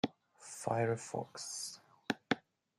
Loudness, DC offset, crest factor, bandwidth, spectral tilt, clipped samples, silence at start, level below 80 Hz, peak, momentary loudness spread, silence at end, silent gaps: -39 LUFS; under 0.1%; 24 dB; 14.5 kHz; -4 dB/octave; under 0.1%; 0.05 s; -80 dBFS; -16 dBFS; 14 LU; 0.4 s; none